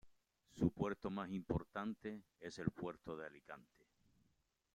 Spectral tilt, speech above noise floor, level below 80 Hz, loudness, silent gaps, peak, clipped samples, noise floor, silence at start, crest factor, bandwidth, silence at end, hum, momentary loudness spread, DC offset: -7.5 dB/octave; 38 dB; -64 dBFS; -45 LUFS; none; -22 dBFS; under 0.1%; -82 dBFS; 0.05 s; 24 dB; 11.5 kHz; 1.1 s; none; 16 LU; under 0.1%